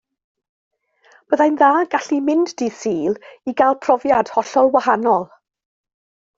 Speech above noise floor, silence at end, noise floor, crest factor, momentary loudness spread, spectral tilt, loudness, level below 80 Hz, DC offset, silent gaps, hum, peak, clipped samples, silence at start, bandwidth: 37 dB; 1.1 s; -54 dBFS; 18 dB; 9 LU; -5 dB/octave; -17 LUFS; -62 dBFS; under 0.1%; none; none; 0 dBFS; under 0.1%; 1.3 s; 7.8 kHz